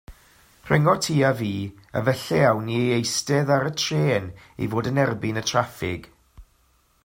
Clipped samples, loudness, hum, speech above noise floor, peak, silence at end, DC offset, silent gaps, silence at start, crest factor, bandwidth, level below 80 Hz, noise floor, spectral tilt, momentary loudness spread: under 0.1%; -23 LUFS; none; 40 dB; -4 dBFS; 0.6 s; under 0.1%; none; 0.1 s; 20 dB; 16.5 kHz; -54 dBFS; -63 dBFS; -5 dB/octave; 10 LU